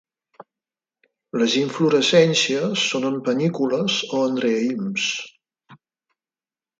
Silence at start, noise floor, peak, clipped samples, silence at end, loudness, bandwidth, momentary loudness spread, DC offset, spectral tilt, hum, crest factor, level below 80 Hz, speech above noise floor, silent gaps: 0.4 s; under -90 dBFS; -4 dBFS; under 0.1%; 1.05 s; -20 LUFS; 9.4 kHz; 8 LU; under 0.1%; -4 dB/octave; none; 20 dB; -70 dBFS; over 70 dB; none